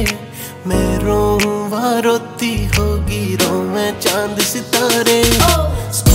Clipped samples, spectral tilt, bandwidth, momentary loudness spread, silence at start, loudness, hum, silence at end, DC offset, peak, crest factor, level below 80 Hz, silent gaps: under 0.1%; -4 dB/octave; 16.5 kHz; 8 LU; 0 s; -15 LUFS; none; 0 s; under 0.1%; 0 dBFS; 16 dB; -24 dBFS; none